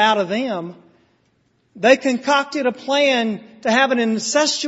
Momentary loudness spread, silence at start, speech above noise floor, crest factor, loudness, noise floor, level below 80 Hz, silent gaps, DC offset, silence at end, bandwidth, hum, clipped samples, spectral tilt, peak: 9 LU; 0 s; 45 dB; 18 dB; -18 LUFS; -63 dBFS; -68 dBFS; none; under 0.1%; 0 s; 8.2 kHz; none; under 0.1%; -3 dB/octave; 0 dBFS